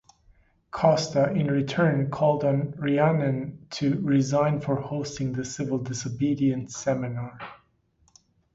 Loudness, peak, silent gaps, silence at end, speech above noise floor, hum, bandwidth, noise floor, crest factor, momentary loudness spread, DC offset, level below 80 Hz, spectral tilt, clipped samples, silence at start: -25 LUFS; -6 dBFS; none; 1 s; 41 dB; none; 8 kHz; -66 dBFS; 20 dB; 10 LU; under 0.1%; -58 dBFS; -6.5 dB/octave; under 0.1%; 0.75 s